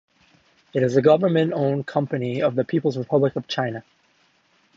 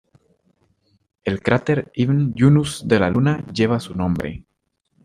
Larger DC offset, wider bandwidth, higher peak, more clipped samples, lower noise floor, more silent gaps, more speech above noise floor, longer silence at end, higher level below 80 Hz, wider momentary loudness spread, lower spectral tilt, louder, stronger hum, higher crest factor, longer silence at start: neither; second, 7.6 kHz vs 11.5 kHz; about the same, -4 dBFS vs -2 dBFS; neither; second, -62 dBFS vs -73 dBFS; neither; second, 41 dB vs 55 dB; first, 0.95 s vs 0.65 s; second, -66 dBFS vs -48 dBFS; about the same, 9 LU vs 11 LU; about the same, -7.5 dB/octave vs -7 dB/octave; second, -22 LUFS vs -19 LUFS; neither; about the same, 18 dB vs 18 dB; second, 0.75 s vs 1.25 s